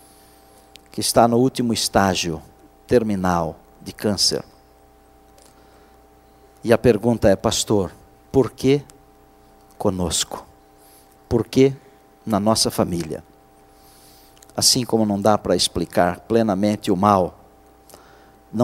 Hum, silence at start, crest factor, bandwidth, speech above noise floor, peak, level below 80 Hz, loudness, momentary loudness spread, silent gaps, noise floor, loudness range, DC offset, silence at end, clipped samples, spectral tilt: none; 0.95 s; 22 dB; 16 kHz; 33 dB; 0 dBFS; -46 dBFS; -19 LUFS; 14 LU; none; -51 dBFS; 5 LU; under 0.1%; 0 s; under 0.1%; -4.5 dB/octave